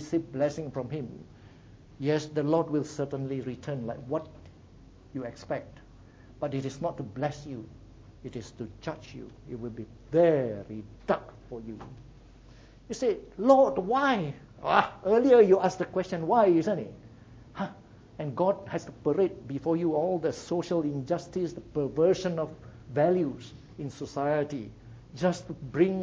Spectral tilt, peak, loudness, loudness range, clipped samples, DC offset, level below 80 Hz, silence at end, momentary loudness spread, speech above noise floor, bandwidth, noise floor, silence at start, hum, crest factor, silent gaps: -7 dB/octave; -6 dBFS; -29 LUFS; 13 LU; under 0.1%; under 0.1%; -58 dBFS; 0 s; 19 LU; 25 dB; 8 kHz; -53 dBFS; 0 s; none; 22 dB; none